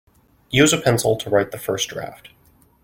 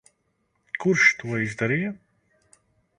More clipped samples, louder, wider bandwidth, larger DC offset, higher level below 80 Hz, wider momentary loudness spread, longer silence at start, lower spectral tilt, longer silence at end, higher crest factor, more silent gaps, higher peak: neither; first, -19 LUFS vs -22 LUFS; first, 16.5 kHz vs 11 kHz; neither; first, -50 dBFS vs -64 dBFS; second, 12 LU vs 16 LU; second, 0.5 s vs 0.75 s; about the same, -4 dB/octave vs -5 dB/octave; second, 0.7 s vs 1 s; about the same, 20 dB vs 22 dB; neither; about the same, -2 dBFS vs -4 dBFS